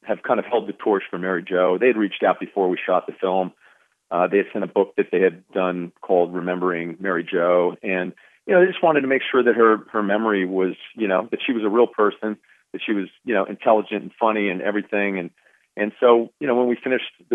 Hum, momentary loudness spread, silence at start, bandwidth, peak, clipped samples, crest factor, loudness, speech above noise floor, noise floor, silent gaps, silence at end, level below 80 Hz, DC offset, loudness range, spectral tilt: none; 9 LU; 0.05 s; 3.9 kHz; -2 dBFS; under 0.1%; 18 dB; -21 LUFS; 27 dB; -47 dBFS; none; 0 s; -82 dBFS; under 0.1%; 4 LU; -8.5 dB/octave